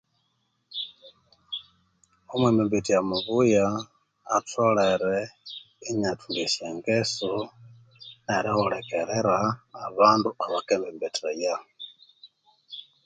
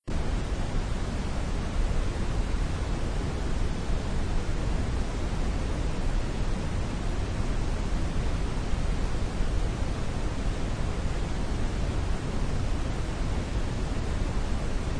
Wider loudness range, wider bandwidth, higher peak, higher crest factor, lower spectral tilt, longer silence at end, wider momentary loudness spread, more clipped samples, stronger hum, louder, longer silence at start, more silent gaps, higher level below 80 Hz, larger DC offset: first, 4 LU vs 0 LU; second, 9.4 kHz vs 10.5 kHz; first, -4 dBFS vs -14 dBFS; first, 22 dB vs 14 dB; second, -4.5 dB/octave vs -6 dB/octave; first, 0.25 s vs 0 s; first, 19 LU vs 1 LU; neither; neither; first, -26 LUFS vs -32 LUFS; first, 0.7 s vs 0.05 s; neither; second, -62 dBFS vs -30 dBFS; neither